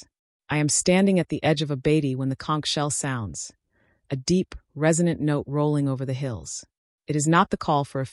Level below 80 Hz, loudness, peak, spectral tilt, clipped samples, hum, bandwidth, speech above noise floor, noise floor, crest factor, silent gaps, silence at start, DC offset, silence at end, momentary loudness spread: -52 dBFS; -24 LUFS; -8 dBFS; -5 dB/octave; under 0.1%; none; 12 kHz; 43 dB; -67 dBFS; 16 dB; 0.19-0.40 s, 6.78-6.98 s; 0 s; under 0.1%; 0 s; 13 LU